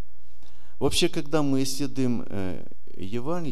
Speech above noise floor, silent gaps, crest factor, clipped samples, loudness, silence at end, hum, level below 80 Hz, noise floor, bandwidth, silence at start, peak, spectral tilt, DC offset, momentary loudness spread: 28 dB; none; 18 dB; under 0.1%; -27 LUFS; 0 s; none; -50 dBFS; -55 dBFS; 15 kHz; 0.8 s; -10 dBFS; -5 dB/octave; 8%; 14 LU